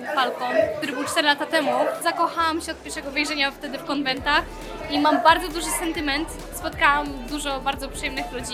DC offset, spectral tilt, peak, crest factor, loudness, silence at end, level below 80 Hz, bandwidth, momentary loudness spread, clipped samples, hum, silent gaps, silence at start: under 0.1%; -2.5 dB/octave; -2 dBFS; 22 dB; -23 LUFS; 0 s; -42 dBFS; 16.5 kHz; 10 LU; under 0.1%; none; none; 0 s